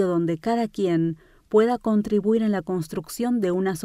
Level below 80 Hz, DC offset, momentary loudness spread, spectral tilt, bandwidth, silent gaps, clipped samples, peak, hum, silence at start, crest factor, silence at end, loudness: -56 dBFS; under 0.1%; 7 LU; -7 dB/octave; 15.5 kHz; none; under 0.1%; -8 dBFS; none; 0 s; 16 dB; 0 s; -23 LUFS